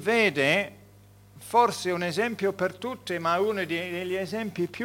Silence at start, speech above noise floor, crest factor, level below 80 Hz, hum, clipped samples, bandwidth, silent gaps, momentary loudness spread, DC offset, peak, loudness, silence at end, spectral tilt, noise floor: 0 s; 27 dB; 20 dB; -66 dBFS; 50 Hz at -50 dBFS; under 0.1%; 18 kHz; none; 9 LU; under 0.1%; -8 dBFS; -27 LUFS; 0 s; -4.5 dB/octave; -53 dBFS